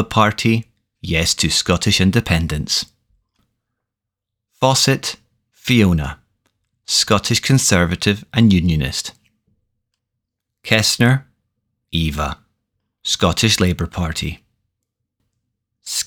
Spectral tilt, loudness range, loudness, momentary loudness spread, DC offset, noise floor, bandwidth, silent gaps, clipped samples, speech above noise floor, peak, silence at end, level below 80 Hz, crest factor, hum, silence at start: -4 dB/octave; 4 LU; -17 LUFS; 13 LU; under 0.1%; -82 dBFS; 20 kHz; none; under 0.1%; 66 dB; 0 dBFS; 0 s; -36 dBFS; 20 dB; none; 0 s